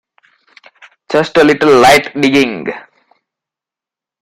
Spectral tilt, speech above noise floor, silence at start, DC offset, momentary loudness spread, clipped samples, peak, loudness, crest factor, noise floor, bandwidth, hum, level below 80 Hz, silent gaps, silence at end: -4.5 dB/octave; 77 dB; 1.1 s; under 0.1%; 16 LU; under 0.1%; 0 dBFS; -10 LUFS; 14 dB; -87 dBFS; 16 kHz; none; -48 dBFS; none; 1.4 s